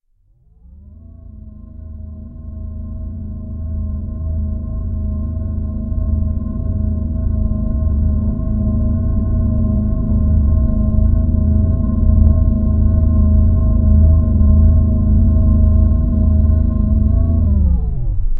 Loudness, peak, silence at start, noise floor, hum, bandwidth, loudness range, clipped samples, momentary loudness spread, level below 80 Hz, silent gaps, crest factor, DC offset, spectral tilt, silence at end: -16 LUFS; 0 dBFS; 0.9 s; -54 dBFS; none; 1.6 kHz; 13 LU; under 0.1%; 15 LU; -16 dBFS; none; 14 dB; under 0.1%; -15.5 dB/octave; 0 s